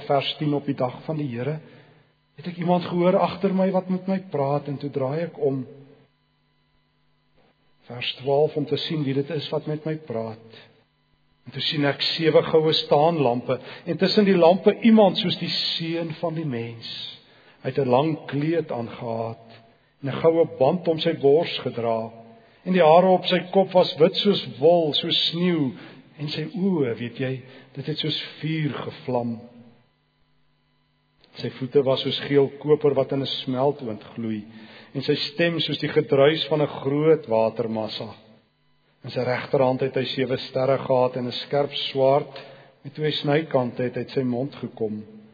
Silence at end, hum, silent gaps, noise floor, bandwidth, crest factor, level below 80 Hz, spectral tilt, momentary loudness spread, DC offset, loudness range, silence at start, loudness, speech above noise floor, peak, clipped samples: 0.15 s; none; none; -66 dBFS; 5 kHz; 20 dB; -70 dBFS; -7.5 dB/octave; 14 LU; under 0.1%; 9 LU; 0 s; -23 LUFS; 44 dB; -2 dBFS; under 0.1%